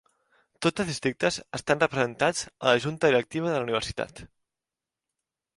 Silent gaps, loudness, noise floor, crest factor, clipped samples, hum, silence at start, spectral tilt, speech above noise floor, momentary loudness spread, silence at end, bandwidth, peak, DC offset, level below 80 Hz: none; -26 LUFS; -89 dBFS; 22 dB; under 0.1%; none; 0.6 s; -4 dB/octave; 63 dB; 7 LU; 1.3 s; 11.5 kHz; -6 dBFS; under 0.1%; -58 dBFS